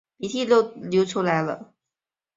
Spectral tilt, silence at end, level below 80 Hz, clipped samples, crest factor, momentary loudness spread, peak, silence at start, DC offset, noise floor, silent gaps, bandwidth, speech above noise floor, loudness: -5.5 dB/octave; 0.75 s; -66 dBFS; under 0.1%; 18 dB; 10 LU; -6 dBFS; 0.2 s; under 0.1%; -89 dBFS; none; 7.8 kHz; 66 dB; -23 LUFS